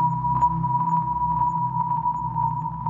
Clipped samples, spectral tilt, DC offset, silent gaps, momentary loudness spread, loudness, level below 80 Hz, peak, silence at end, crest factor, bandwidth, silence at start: under 0.1%; -10 dB/octave; under 0.1%; none; 4 LU; -23 LUFS; -44 dBFS; -10 dBFS; 0 s; 12 dB; 7.4 kHz; 0 s